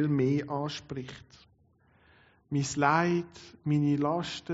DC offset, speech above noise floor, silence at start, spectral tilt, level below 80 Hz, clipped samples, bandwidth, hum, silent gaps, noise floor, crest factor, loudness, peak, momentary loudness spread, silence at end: under 0.1%; 36 dB; 0 s; -6 dB/octave; -64 dBFS; under 0.1%; 8 kHz; none; none; -65 dBFS; 20 dB; -30 LUFS; -10 dBFS; 15 LU; 0 s